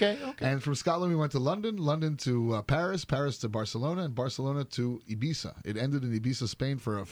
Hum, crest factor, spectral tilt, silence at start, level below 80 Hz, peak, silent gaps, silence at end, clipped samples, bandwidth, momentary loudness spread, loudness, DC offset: none; 18 dB; -6 dB/octave; 0 s; -56 dBFS; -12 dBFS; none; 0 s; under 0.1%; 12.5 kHz; 5 LU; -31 LUFS; under 0.1%